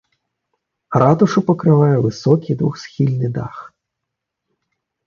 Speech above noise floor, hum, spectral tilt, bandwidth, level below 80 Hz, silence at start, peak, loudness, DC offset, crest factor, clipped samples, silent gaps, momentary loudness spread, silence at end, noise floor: 64 dB; none; -8.5 dB/octave; 7.2 kHz; -54 dBFS; 0.9 s; 0 dBFS; -16 LUFS; under 0.1%; 18 dB; under 0.1%; none; 10 LU; 1.4 s; -80 dBFS